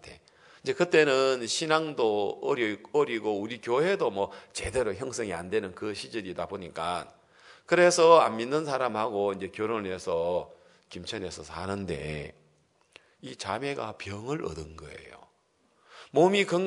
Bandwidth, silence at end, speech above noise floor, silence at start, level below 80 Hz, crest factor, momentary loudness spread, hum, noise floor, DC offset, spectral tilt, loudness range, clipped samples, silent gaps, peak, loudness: 11 kHz; 0 s; 41 dB; 0.05 s; -60 dBFS; 22 dB; 16 LU; none; -69 dBFS; under 0.1%; -4 dB/octave; 12 LU; under 0.1%; none; -6 dBFS; -28 LUFS